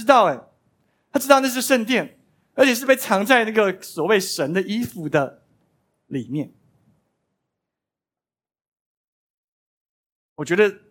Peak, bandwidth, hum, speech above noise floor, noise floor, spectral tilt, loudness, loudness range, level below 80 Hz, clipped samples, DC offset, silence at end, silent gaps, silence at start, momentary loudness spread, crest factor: 0 dBFS; 17.5 kHz; none; over 71 dB; under -90 dBFS; -4 dB/octave; -20 LUFS; 17 LU; -70 dBFS; under 0.1%; under 0.1%; 0.15 s; 8.68-8.72 s, 8.80-10.36 s; 0 s; 15 LU; 22 dB